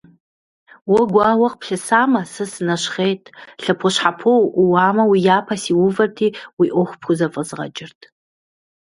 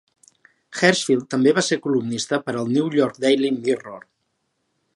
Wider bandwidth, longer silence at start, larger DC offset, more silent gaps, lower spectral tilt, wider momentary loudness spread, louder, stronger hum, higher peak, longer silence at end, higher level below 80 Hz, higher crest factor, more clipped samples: about the same, 11.5 kHz vs 11.5 kHz; first, 0.85 s vs 0.7 s; neither; first, 6.53-6.57 s vs none; about the same, -5 dB/octave vs -4.5 dB/octave; first, 12 LU vs 6 LU; first, -17 LUFS vs -20 LUFS; neither; about the same, 0 dBFS vs -2 dBFS; about the same, 0.9 s vs 0.95 s; first, -62 dBFS vs -70 dBFS; about the same, 18 dB vs 20 dB; neither